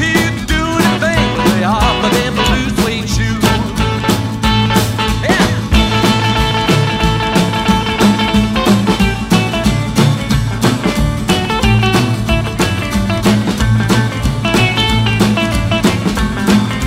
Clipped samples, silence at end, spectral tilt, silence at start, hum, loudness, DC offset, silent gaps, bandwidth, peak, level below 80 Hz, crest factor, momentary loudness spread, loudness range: under 0.1%; 0 s; -5 dB/octave; 0 s; none; -13 LUFS; under 0.1%; none; 16.5 kHz; 0 dBFS; -24 dBFS; 12 dB; 4 LU; 1 LU